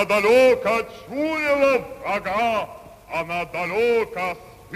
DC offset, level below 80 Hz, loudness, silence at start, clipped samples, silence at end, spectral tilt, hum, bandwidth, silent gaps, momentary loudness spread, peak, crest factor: under 0.1%; -54 dBFS; -21 LUFS; 0 s; under 0.1%; 0 s; -4.5 dB/octave; none; 15.5 kHz; none; 13 LU; -6 dBFS; 16 dB